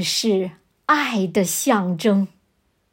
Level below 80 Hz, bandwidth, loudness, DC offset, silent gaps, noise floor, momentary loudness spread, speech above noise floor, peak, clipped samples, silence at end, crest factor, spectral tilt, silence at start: -66 dBFS; 16.5 kHz; -20 LUFS; under 0.1%; none; -66 dBFS; 10 LU; 47 dB; -4 dBFS; under 0.1%; 0.65 s; 18 dB; -4 dB/octave; 0 s